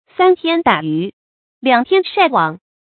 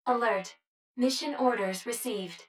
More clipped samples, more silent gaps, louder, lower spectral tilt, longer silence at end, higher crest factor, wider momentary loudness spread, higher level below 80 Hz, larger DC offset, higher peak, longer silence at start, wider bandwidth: neither; first, 1.13-1.61 s vs 0.67-0.95 s; first, -15 LUFS vs -30 LUFS; first, -8 dB/octave vs -3.5 dB/octave; first, 0.3 s vs 0.05 s; about the same, 16 dB vs 18 dB; about the same, 8 LU vs 8 LU; first, -60 dBFS vs -80 dBFS; neither; first, 0 dBFS vs -12 dBFS; first, 0.2 s vs 0.05 s; second, 4.6 kHz vs 17.5 kHz